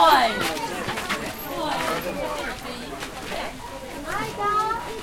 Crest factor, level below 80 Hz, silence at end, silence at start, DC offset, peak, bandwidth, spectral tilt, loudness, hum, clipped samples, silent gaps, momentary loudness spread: 22 dB; -46 dBFS; 0 s; 0 s; under 0.1%; -4 dBFS; 16.5 kHz; -3 dB/octave; -26 LUFS; none; under 0.1%; none; 11 LU